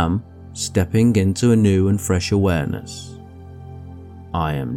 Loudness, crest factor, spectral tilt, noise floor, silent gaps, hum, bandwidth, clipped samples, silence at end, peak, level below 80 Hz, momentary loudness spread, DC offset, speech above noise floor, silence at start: -19 LUFS; 14 dB; -6 dB/octave; -38 dBFS; none; none; 17 kHz; under 0.1%; 0 s; -4 dBFS; -40 dBFS; 22 LU; under 0.1%; 20 dB; 0 s